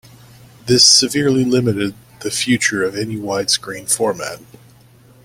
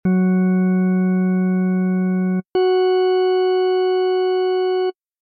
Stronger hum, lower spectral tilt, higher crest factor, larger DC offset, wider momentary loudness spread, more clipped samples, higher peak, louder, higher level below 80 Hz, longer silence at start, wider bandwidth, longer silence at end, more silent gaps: neither; second, -3 dB/octave vs -10.5 dB/octave; first, 18 dB vs 6 dB; neither; first, 17 LU vs 3 LU; neither; first, 0 dBFS vs -10 dBFS; first, -15 LUFS vs -18 LUFS; first, -52 dBFS vs -62 dBFS; first, 0.65 s vs 0.05 s; first, 16.5 kHz vs 4.7 kHz; first, 0.8 s vs 0.3 s; neither